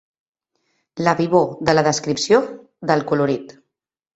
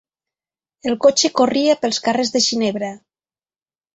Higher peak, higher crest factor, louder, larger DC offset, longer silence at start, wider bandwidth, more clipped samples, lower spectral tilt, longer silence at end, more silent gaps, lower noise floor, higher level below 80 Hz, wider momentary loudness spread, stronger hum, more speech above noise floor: about the same, -2 dBFS vs -2 dBFS; about the same, 18 dB vs 18 dB; about the same, -19 LUFS vs -17 LUFS; neither; about the same, 0.95 s vs 0.85 s; about the same, 8.2 kHz vs 8.4 kHz; neither; first, -5 dB/octave vs -2.5 dB/octave; second, 0.65 s vs 1 s; neither; second, -78 dBFS vs under -90 dBFS; about the same, -58 dBFS vs -62 dBFS; about the same, 11 LU vs 12 LU; neither; second, 60 dB vs over 73 dB